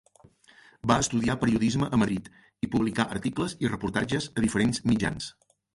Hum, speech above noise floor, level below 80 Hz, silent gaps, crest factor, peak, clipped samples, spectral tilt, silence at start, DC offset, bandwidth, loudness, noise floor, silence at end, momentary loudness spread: none; 31 dB; -50 dBFS; none; 20 dB; -8 dBFS; under 0.1%; -5 dB/octave; 0.85 s; under 0.1%; 11.5 kHz; -27 LUFS; -58 dBFS; 0.45 s; 7 LU